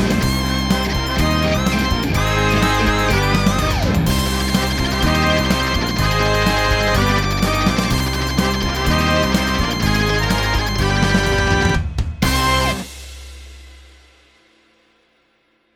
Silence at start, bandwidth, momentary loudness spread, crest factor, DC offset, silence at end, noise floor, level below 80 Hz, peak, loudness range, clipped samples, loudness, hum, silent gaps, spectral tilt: 0 s; over 20 kHz; 3 LU; 16 dB; under 0.1%; 1.95 s; -61 dBFS; -24 dBFS; -2 dBFS; 4 LU; under 0.1%; -17 LUFS; none; none; -4.5 dB/octave